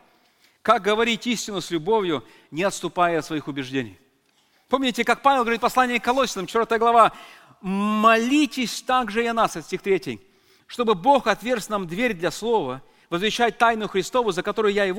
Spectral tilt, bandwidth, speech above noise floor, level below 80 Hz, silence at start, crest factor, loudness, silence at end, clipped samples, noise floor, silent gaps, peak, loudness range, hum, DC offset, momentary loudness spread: -4 dB/octave; 17 kHz; 42 dB; -54 dBFS; 0.65 s; 20 dB; -22 LUFS; 0 s; under 0.1%; -63 dBFS; none; -2 dBFS; 4 LU; none; under 0.1%; 11 LU